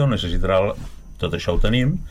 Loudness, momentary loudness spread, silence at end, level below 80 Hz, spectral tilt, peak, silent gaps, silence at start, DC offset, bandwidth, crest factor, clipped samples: -22 LUFS; 11 LU; 0 s; -26 dBFS; -6.5 dB/octave; -6 dBFS; none; 0 s; under 0.1%; 11 kHz; 14 dB; under 0.1%